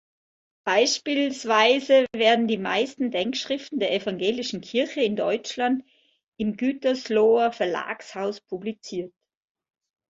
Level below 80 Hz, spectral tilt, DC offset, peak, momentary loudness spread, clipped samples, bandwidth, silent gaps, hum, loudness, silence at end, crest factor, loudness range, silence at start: -68 dBFS; -3.5 dB/octave; under 0.1%; -6 dBFS; 13 LU; under 0.1%; 8 kHz; 6.28-6.32 s; none; -24 LUFS; 1 s; 20 dB; 5 LU; 0.65 s